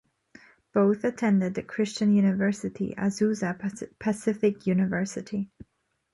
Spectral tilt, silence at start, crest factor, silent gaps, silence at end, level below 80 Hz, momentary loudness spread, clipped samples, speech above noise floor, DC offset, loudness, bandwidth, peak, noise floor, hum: -6.5 dB/octave; 0.75 s; 16 dB; none; 0.65 s; -64 dBFS; 10 LU; under 0.1%; 30 dB; under 0.1%; -27 LUFS; 11.5 kHz; -10 dBFS; -55 dBFS; none